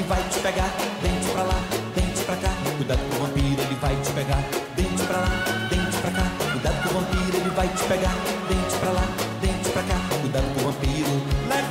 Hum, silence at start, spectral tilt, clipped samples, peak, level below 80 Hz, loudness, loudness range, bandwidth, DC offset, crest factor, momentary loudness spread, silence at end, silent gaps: none; 0 s; -4.5 dB/octave; under 0.1%; -12 dBFS; -32 dBFS; -24 LUFS; 1 LU; 16 kHz; under 0.1%; 12 dB; 2 LU; 0 s; none